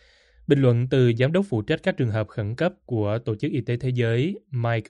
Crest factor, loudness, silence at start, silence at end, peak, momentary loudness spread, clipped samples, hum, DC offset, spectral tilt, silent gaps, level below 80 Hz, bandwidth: 18 dB; -24 LUFS; 0.5 s; 0.05 s; -6 dBFS; 8 LU; under 0.1%; none; under 0.1%; -8.5 dB/octave; none; -56 dBFS; 8.6 kHz